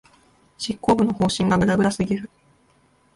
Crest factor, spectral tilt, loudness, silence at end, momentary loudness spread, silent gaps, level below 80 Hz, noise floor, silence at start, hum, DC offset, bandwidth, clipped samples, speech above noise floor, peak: 16 dB; -6 dB/octave; -21 LUFS; 0.9 s; 11 LU; none; -48 dBFS; -60 dBFS; 0.6 s; none; under 0.1%; 11.5 kHz; under 0.1%; 40 dB; -6 dBFS